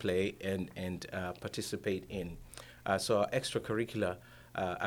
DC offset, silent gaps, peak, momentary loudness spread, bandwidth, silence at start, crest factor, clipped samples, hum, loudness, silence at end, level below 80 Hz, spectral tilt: under 0.1%; none; -16 dBFS; 13 LU; over 20 kHz; 0 s; 20 dB; under 0.1%; none; -36 LUFS; 0 s; -60 dBFS; -5 dB/octave